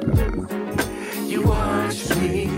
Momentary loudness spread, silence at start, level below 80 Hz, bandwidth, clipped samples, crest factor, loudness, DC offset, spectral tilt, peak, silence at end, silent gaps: 6 LU; 0 s; -30 dBFS; 16.5 kHz; under 0.1%; 14 dB; -23 LUFS; under 0.1%; -5.5 dB/octave; -8 dBFS; 0 s; none